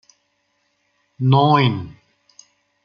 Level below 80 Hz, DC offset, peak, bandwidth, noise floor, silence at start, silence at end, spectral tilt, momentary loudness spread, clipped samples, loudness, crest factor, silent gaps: -58 dBFS; under 0.1%; -2 dBFS; 7 kHz; -68 dBFS; 1.2 s; 0.9 s; -7.5 dB/octave; 17 LU; under 0.1%; -17 LUFS; 20 dB; none